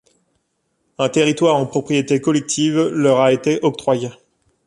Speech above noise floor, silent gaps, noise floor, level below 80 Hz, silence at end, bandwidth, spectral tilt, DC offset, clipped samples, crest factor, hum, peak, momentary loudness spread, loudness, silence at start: 53 dB; none; -69 dBFS; -60 dBFS; 0.55 s; 11.5 kHz; -5 dB/octave; under 0.1%; under 0.1%; 16 dB; none; -2 dBFS; 6 LU; -17 LUFS; 1 s